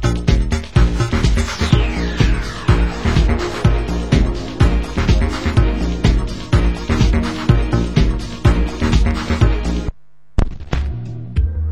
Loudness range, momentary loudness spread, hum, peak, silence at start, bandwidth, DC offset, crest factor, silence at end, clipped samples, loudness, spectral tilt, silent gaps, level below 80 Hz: 2 LU; 6 LU; none; 0 dBFS; 0 s; 11 kHz; 2%; 16 dB; 0 s; under 0.1%; -18 LUFS; -6.5 dB/octave; none; -18 dBFS